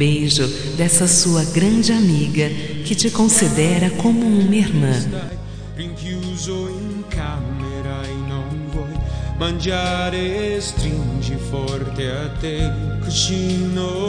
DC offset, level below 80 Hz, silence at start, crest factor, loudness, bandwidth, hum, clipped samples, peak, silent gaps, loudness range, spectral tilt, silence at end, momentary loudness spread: under 0.1%; -32 dBFS; 0 s; 18 dB; -19 LUFS; 10.5 kHz; none; under 0.1%; 0 dBFS; none; 10 LU; -4.5 dB/octave; 0 s; 13 LU